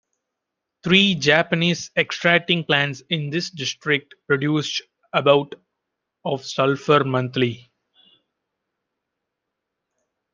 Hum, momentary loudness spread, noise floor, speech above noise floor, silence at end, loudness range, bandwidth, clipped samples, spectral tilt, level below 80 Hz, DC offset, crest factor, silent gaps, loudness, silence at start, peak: none; 11 LU; -82 dBFS; 62 dB; 2.75 s; 5 LU; 7.6 kHz; under 0.1%; -4.5 dB/octave; -64 dBFS; under 0.1%; 22 dB; none; -20 LUFS; 0.85 s; 0 dBFS